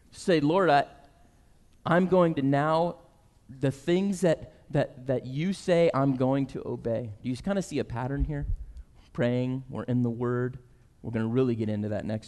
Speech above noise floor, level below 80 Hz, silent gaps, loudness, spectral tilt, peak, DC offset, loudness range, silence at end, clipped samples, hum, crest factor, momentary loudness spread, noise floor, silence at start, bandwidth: 32 dB; -44 dBFS; none; -28 LUFS; -7 dB/octave; -12 dBFS; under 0.1%; 5 LU; 0 s; under 0.1%; none; 16 dB; 12 LU; -58 dBFS; 0.15 s; 12 kHz